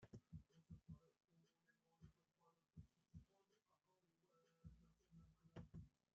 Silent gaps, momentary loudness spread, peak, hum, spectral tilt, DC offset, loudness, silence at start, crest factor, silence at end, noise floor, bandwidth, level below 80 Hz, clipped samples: none; 7 LU; -46 dBFS; none; -8 dB/octave; under 0.1%; -66 LUFS; 0 s; 22 dB; 0.25 s; -87 dBFS; 6.8 kHz; -78 dBFS; under 0.1%